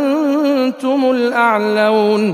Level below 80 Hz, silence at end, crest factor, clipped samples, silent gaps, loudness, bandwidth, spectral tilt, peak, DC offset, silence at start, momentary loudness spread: -70 dBFS; 0 s; 14 dB; under 0.1%; none; -14 LUFS; 15.5 kHz; -6 dB/octave; 0 dBFS; under 0.1%; 0 s; 3 LU